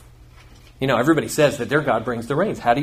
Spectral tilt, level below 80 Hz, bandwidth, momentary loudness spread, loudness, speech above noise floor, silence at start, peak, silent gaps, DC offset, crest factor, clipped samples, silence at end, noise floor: -5.5 dB/octave; -48 dBFS; 15.5 kHz; 6 LU; -20 LUFS; 26 dB; 0.8 s; -4 dBFS; none; under 0.1%; 16 dB; under 0.1%; 0 s; -46 dBFS